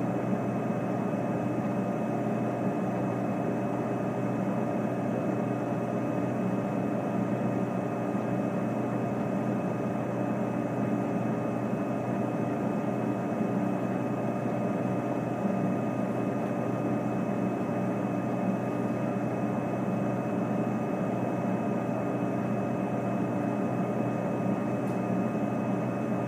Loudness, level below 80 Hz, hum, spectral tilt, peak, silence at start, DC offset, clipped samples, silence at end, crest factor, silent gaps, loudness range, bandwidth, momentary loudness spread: -30 LUFS; -66 dBFS; none; -8.5 dB/octave; -16 dBFS; 0 s; under 0.1%; under 0.1%; 0 s; 14 dB; none; 0 LU; 15.5 kHz; 1 LU